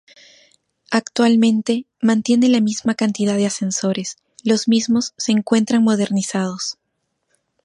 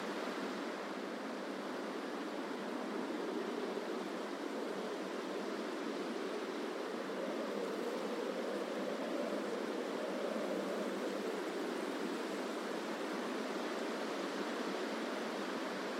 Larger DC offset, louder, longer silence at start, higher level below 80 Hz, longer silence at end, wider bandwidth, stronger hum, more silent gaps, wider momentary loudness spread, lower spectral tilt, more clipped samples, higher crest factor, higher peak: neither; first, -18 LUFS vs -40 LUFS; first, 0.9 s vs 0 s; first, -66 dBFS vs under -90 dBFS; first, 0.9 s vs 0 s; second, 11.5 kHz vs 16 kHz; neither; neither; first, 8 LU vs 3 LU; about the same, -4.5 dB/octave vs -4 dB/octave; neither; about the same, 16 dB vs 14 dB; first, -2 dBFS vs -26 dBFS